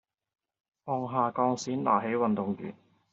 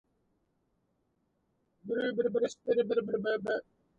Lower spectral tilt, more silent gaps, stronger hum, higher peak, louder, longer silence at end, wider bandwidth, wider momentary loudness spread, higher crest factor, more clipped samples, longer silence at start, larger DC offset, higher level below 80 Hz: about the same, -6 dB/octave vs -5.5 dB/octave; neither; neither; first, -12 dBFS vs -18 dBFS; first, -29 LUFS vs -32 LUFS; about the same, 0.4 s vs 0.35 s; about the same, 7.4 kHz vs 8 kHz; first, 11 LU vs 8 LU; about the same, 20 dB vs 16 dB; neither; second, 0.85 s vs 1.85 s; neither; about the same, -74 dBFS vs -76 dBFS